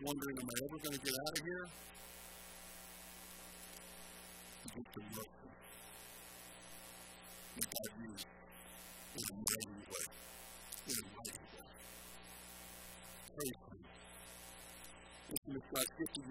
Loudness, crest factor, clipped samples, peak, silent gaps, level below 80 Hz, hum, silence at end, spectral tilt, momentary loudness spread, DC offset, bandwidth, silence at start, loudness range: -47 LUFS; 30 dB; under 0.1%; -18 dBFS; 15.37-15.42 s; -68 dBFS; 60 Hz at -65 dBFS; 0 s; -2.5 dB/octave; 14 LU; under 0.1%; 16.5 kHz; 0 s; 8 LU